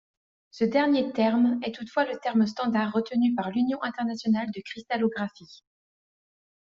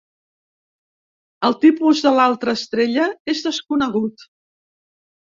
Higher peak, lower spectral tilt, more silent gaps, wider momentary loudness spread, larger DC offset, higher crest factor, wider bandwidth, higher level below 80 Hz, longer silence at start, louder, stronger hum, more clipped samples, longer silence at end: second, -10 dBFS vs -2 dBFS; about the same, -4.5 dB/octave vs -4.5 dB/octave; second, none vs 3.20-3.25 s; about the same, 8 LU vs 8 LU; neither; about the same, 16 dB vs 18 dB; about the same, 7.2 kHz vs 7.6 kHz; second, -70 dBFS vs -62 dBFS; second, 0.55 s vs 1.4 s; second, -26 LUFS vs -18 LUFS; neither; neither; about the same, 1.1 s vs 1.1 s